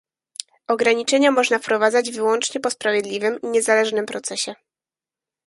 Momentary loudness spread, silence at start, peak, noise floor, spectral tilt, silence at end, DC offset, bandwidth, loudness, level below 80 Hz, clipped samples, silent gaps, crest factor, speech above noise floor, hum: 11 LU; 0.7 s; -2 dBFS; under -90 dBFS; -2 dB/octave; 0.9 s; under 0.1%; 11.5 kHz; -20 LUFS; -72 dBFS; under 0.1%; none; 18 dB; over 70 dB; none